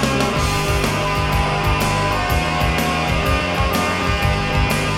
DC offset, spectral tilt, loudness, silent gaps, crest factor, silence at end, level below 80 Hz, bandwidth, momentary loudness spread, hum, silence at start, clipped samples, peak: under 0.1%; -4.5 dB/octave; -18 LUFS; none; 16 dB; 0 s; -26 dBFS; 17.5 kHz; 1 LU; none; 0 s; under 0.1%; -2 dBFS